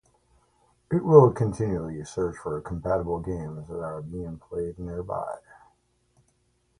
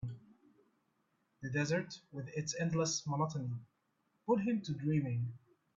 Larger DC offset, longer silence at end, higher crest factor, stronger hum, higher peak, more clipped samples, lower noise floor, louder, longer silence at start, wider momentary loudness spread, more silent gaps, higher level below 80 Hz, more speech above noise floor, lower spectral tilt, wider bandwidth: neither; first, 1.4 s vs 0.4 s; first, 24 dB vs 18 dB; first, 60 Hz at -55 dBFS vs none; first, -2 dBFS vs -20 dBFS; neither; second, -69 dBFS vs -80 dBFS; first, -26 LUFS vs -37 LUFS; first, 0.9 s vs 0 s; first, 18 LU vs 14 LU; neither; first, -48 dBFS vs -70 dBFS; about the same, 44 dB vs 43 dB; first, -9 dB/octave vs -5.5 dB/octave; first, 10.5 kHz vs 7.8 kHz